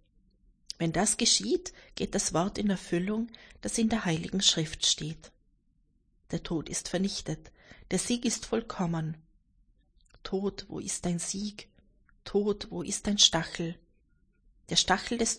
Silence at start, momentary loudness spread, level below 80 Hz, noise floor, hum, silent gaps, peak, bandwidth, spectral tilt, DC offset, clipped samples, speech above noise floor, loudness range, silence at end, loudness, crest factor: 0.8 s; 15 LU; -52 dBFS; -69 dBFS; none; none; -6 dBFS; 10.5 kHz; -3 dB/octave; under 0.1%; under 0.1%; 39 dB; 6 LU; 0 s; -29 LUFS; 26 dB